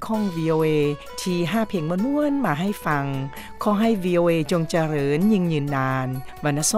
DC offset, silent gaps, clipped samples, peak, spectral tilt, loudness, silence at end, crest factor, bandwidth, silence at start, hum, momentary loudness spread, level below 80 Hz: under 0.1%; none; under 0.1%; -8 dBFS; -5.5 dB/octave; -22 LUFS; 0 s; 14 dB; 16 kHz; 0 s; none; 7 LU; -50 dBFS